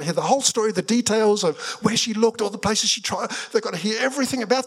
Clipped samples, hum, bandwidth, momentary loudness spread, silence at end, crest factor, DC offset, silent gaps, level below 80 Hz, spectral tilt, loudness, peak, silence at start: under 0.1%; none; 15.5 kHz; 6 LU; 0 s; 18 dB; under 0.1%; none; -60 dBFS; -3 dB/octave; -21 LUFS; -4 dBFS; 0 s